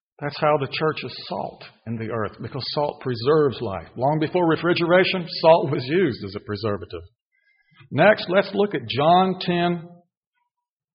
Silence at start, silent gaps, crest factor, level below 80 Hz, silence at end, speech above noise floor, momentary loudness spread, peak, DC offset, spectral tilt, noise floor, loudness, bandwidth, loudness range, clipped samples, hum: 0.2 s; 7.21-7.31 s; 20 dB; -58 dBFS; 1 s; 61 dB; 14 LU; -2 dBFS; under 0.1%; -4 dB/octave; -83 dBFS; -22 LUFS; 5.6 kHz; 5 LU; under 0.1%; none